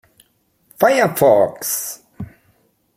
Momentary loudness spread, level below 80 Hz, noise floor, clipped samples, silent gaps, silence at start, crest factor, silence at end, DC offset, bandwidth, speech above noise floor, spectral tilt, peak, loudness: 22 LU; -56 dBFS; -61 dBFS; under 0.1%; none; 0.8 s; 18 dB; 0.7 s; under 0.1%; 16.5 kHz; 47 dB; -4 dB/octave; -2 dBFS; -16 LUFS